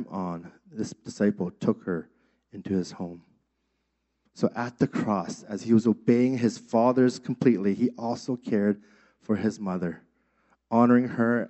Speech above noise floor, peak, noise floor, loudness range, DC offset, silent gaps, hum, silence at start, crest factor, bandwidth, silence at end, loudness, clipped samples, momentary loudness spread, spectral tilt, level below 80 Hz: 51 dB; -8 dBFS; -77 dBFS; 8 LU; under 0.1%; none; none; 0 s; 18 dB; 8.2 kHz; 0 s; -26 LUFS; under 0.1%; 14 LU; -7.5 dB/octave; -70 dBFS